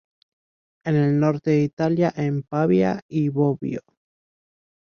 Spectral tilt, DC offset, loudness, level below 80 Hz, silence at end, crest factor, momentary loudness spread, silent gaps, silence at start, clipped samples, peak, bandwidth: -9 dB/octave; under 0.1%; -22 LUFS; -60 dBFS; 1.05 s; 16 dB; 9 LU; 1.73-1.77 s, 3.02-3.09 s; 0.85 s; under 0.1%; -6 dBFS; 6.8 kHz